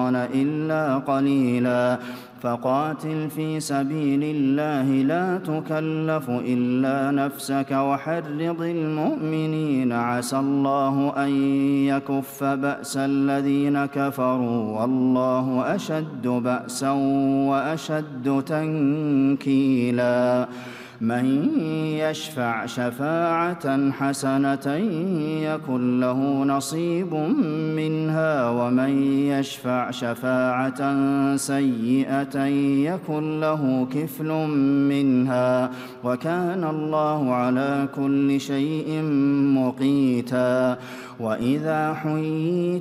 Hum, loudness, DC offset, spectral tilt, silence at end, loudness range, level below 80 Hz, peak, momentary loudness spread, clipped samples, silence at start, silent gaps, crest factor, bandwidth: none; -23 LUFS; under 0.1%; -6.5 dB/octave; 0 s; 2 LU; -68 dBFS; -10 dBFS; 6 LU; under 0.1%; 0 s; none; 12 dB; 15 kHz